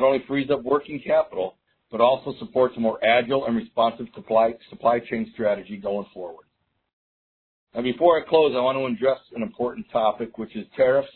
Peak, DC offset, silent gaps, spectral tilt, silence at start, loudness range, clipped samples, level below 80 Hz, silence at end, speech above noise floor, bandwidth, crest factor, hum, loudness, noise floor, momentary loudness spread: -4 dBFS; under 0.1%; 6.93-7.67 s; -9.5 dB/octave; 0 s; 4 LU; under 0.1%; -60 dBFS; 0.05 s; over 67 dB; 4.4 kHz; 18 dB; none; -23 LUFS; under -90 dBFS; 13 LU